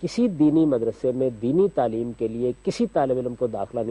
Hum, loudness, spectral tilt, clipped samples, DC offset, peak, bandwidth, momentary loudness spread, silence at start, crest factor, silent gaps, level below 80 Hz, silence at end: none; -23 LUFS; -7.5 dB/octave; under 0.1%; under 0.1%; -10 dBFS; 10.5 kHz; 8 LU; 0 s; 14 dB; none; -54 dBFS; 0 s